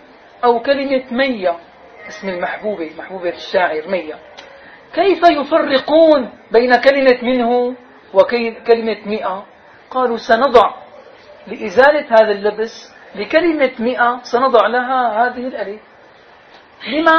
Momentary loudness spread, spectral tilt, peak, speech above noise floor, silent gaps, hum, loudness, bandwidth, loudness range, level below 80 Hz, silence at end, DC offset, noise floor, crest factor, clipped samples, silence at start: 16 LU; -5 dB/octave; 0 dBFS; 29 dB; none; none; -15 LUFS; 6.6 kHz; 7 LU; -54 dBFS; 0 s; under 0.1%; -44 dBFS; 16 dB; under 0.1%; 0.45 s